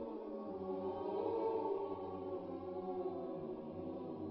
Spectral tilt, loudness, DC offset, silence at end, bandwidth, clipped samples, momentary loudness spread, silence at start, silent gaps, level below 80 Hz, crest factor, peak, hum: -7.5 dB/octave; -43 LUFS; under 0.1%; 0 s; 5.6 kHz; under 0.1%; 7 LU; 0 s; none; -70 dBFS; 16 dB; -26 dBFS; none